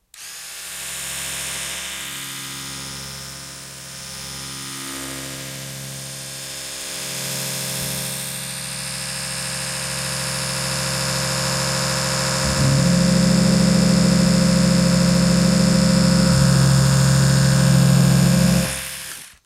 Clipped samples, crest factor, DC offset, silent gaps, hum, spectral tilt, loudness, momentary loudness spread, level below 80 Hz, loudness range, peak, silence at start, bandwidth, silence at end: under 0.1%; 16 dB; under 0.1%; none; none; -4.5 dB/octave; -19 LUFS; 15 LU; -38 dBFS; 14 LU; -4 dBFS; 0.15 s; 16 kHz; 0.15 s